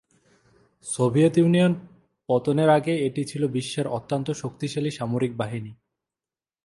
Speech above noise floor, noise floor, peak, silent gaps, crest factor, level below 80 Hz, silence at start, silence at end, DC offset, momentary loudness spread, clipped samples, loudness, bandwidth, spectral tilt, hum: over 67 dB; under -90 dBFS; -6 dBFS; none; 20 dB; -62 dBFS; 0.85 s; 0.9 s; under 0.1%; 12 LU; under 0.1%; -24 LUFS; 11.5 kHz; -6.5 dB/octave; none